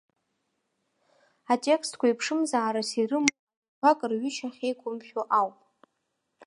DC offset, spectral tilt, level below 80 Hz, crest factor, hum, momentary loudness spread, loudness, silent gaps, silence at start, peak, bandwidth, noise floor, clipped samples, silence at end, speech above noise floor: under 0.1%; -3 dB/octave; -86 dBFS; 28 dB; none; 8 LU; -27 LUFS; 3.39-3.47 s, 3.57-3.62 s, 3.68-3.82 s; 1.5 s; -2 dBFS; 11.5 kHz; -79 dBFS; under 0.1%; 0 s; 53 dB